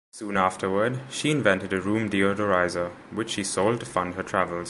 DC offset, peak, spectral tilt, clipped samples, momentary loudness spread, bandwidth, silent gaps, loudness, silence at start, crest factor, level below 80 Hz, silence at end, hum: under 0.1%; -4 dBFS; -4.5 dB/octave; under 0.1%; 6 LU; 11.5 kHz; none; -25 LUFS; 0.15 s; 20 dB; -54 dBFS; 0 s; none